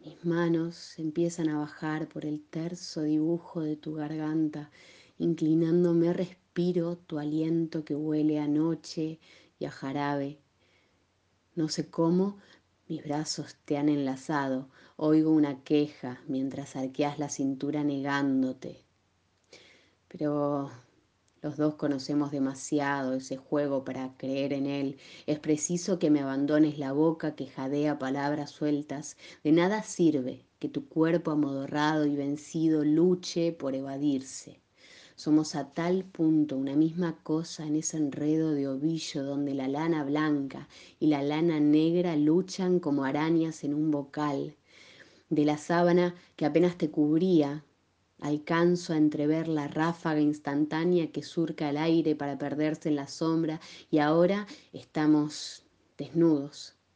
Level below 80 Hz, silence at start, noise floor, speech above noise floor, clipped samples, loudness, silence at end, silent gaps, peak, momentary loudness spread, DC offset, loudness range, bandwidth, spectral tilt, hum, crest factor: -74 dBFS; 0.05 s; -71 dBFS; 42 dB; under 0.1%; -29 LUFS; 0.25 s; none; -12 dBFS; 11 LU; under 0.1%; 5 LU; 9.6 kHz; -6 dB/octave; none; 18 dB